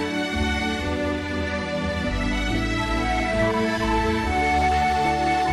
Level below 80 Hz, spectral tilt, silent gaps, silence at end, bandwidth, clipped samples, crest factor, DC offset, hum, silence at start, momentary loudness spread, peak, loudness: -32 dBFS; -5.5 dB/octave; none; 0 s; 13 kHz; under 0.1%; 12 dB; under 0.1%; none; 0 s; 5 LU; -12 dBFS; -23 LUFS